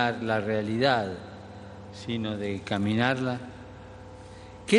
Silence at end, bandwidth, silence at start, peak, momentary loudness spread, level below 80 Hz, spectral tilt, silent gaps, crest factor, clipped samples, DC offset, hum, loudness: 0 s; 11.5 kHz; 0 s; -8 dBFS; 21 LU; -56 dBFS; -6 dB/octave; none; 20 dB; under 0.1%; under 0.1%; none; -28 LUFS